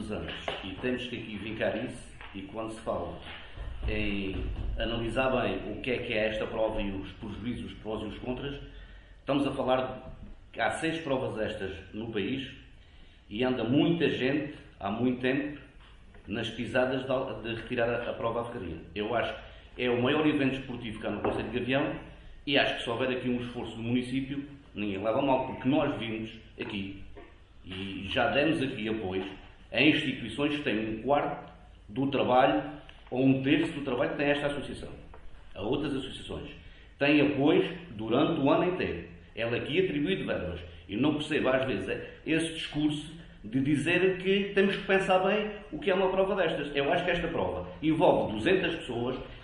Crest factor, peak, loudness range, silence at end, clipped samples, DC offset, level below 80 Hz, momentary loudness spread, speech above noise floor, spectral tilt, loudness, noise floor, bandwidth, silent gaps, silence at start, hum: 22 dB; -8 dBFS; 6 LU; 0 s; under 0.1%; under 0.1%; -48 dBFS; 15 LU; 23 dB; -6.5 dB/octave; -30 LUFS; -53 dBFS; 11 kHz; none; 0 s; none